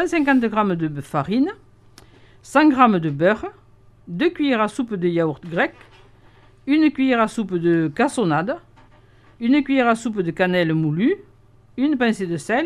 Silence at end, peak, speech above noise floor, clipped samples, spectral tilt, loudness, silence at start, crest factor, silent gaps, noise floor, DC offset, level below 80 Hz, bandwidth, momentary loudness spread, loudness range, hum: 0 s; -2 dBFS; 32 dB; under 0.1%; -6.5 dB/octave; -20 LUFS; 0 s; 18 dB; none; -51 dBFS; under 0.1%; -54 dBFS; 12 kHz; 8 LU; 2 LU; none